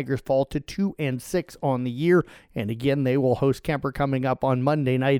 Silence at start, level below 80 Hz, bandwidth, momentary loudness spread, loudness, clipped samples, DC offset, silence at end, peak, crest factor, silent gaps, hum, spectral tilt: 0 s; -50 dBFS; 16.5 kHz; 7 LU; -24 LUFS; under 0.1%; under 0.1%; 0 s; -8 dBFS; 14 dB; none; none; -7.5 dB/octave